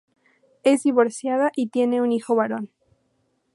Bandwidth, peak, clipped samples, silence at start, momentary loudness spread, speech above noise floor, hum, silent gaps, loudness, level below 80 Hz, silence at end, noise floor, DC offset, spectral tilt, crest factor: 11.5 kHz; -4 dBFS; under 0.1%; 0.65 s; 7 LU; 48 dB; none; none; -22 LUFS; -78 dBFS; 0.9 s; -69 dBFS; under 0.1%; -5 dB/octave; 20 dB